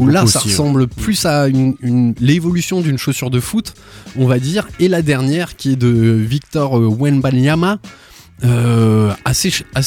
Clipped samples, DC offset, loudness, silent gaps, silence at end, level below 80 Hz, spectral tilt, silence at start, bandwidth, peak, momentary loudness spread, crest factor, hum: under 0.1%; under 0.1%; -14 LUFS; none; 0 s; -38 dBFS; -5.5 dB/octave; 0 s; 17.5 kHz; -2 dBFS; 6 LU; 12 dB; none